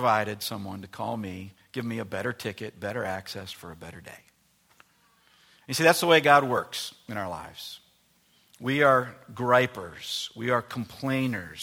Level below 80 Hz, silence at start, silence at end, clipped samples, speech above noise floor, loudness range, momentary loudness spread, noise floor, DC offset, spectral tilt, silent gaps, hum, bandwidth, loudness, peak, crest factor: -66 dBFS; 0 s; 0 s; under 0.1%; 38 dB; 11 LU; 20 LU; -65 dBFS; under 0.1%; -4.5 dB/octave; none; none; 17 kHz; -26 LUFS; -4 dBFS; 24 dB